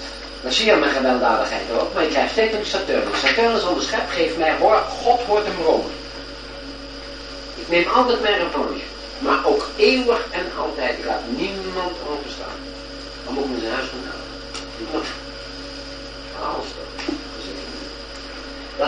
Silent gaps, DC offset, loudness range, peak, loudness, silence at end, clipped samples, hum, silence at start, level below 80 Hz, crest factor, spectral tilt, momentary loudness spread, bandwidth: none; under 0.1%; 11 LU; -2 dBFS; -21 LUFS; 0 s; under 0.1%; none; 0 s; -42 dBFS; 20 dB; -3.5 dB/octave; 16 LU; 10 kHz